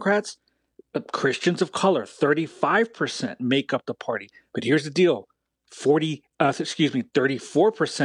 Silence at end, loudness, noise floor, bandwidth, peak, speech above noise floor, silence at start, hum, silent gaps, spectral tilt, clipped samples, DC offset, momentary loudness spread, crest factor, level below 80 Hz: 0 s; -24 LUFS; -57 dBFS; 11 kHz; -6 dBFS; 34 dB; 0 s; none; none; -5 dB/octave; under 0.1%; under 0.1%; 9 LU; 18 dB; -74 dBFS